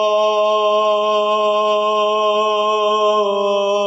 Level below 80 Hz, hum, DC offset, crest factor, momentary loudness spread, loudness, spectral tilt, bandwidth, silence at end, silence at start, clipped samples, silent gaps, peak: under -90 dBFS; none; under 0.1%; 8 dB; 1 LU; -16 LUFS; -3 dB/octave; 8 kHz; 0 s; 0 s; under 0.1%; none; -6 dBFS